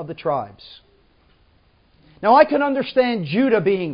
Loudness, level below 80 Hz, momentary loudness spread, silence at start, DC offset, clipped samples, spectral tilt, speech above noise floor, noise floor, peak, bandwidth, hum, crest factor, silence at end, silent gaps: -18 LUFS; -60 dBFS; 10 LU; 0 s; under 0.1%; under 0.1%; -10.5 dB/octave; 39 dB; -57 dBFS; 0 dBFS; 5.4 kHz; none; 20 dB; 0 s; none